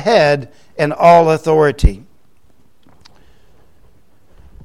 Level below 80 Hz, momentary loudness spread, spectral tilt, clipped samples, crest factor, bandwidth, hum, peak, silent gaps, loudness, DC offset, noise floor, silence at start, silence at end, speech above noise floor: -26 dBFS; 13 LU; -6 dB/octave; under 0.1%; 16 dB; 12.5 kHz; none; 0 dBFS; none; -13 LUFS; 0.7%; -55 dBFS; 0 s; 2.7 s; 43 dB